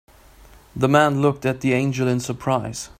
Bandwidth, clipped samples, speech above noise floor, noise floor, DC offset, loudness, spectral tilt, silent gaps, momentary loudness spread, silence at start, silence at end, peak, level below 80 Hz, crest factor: 15.5 kHz; under 0.1%; 28 dB; -48 dBFS; under 0.1%; -20 LUFS; -6 dB/octave; none; 7 LU; 0.75 s; 0.15 s; -2 dBFS; -50 dBFS; 20 dB